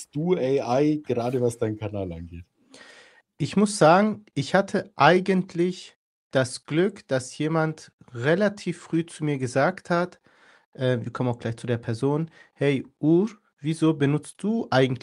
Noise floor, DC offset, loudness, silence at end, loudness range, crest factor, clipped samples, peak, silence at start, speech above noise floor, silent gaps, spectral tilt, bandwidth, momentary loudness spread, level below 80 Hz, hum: -53 dBFS; under 0.1%; -24 LUFS; 0.05 s; 5 LU; 22 dB; under 0.1%; -2 dBFS; 0 s; 29 dB; 5.96-6.30 s, 7.93-7.98 s, 10.65-10.72 s, 13.53-13.57 s; -6 dB/octave; 12 kHz; 11 LU; -62 dBFS; none